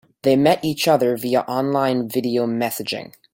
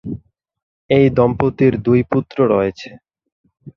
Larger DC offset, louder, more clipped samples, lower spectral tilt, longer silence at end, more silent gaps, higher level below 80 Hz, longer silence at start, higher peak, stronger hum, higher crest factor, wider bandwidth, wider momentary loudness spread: neither; second, -20 LUFS vs -16 LUFS; neither; second, -5 dB/octave vs -9 dB/octave; first, 0.25 s vs 0.05 s; second, none vs 0.63-0.89 s, 3.32-3.44 s; second, -60 dBFS vs -44 dBFS; first, 0.25 s vs 0.05 s; about the same, -4 dBFS vs -2 dBFS; neither; about the same, 16 dB vs 16 dB; first, 17 kHz vs 6.8 kHz; second, 7 LU vs 18 LU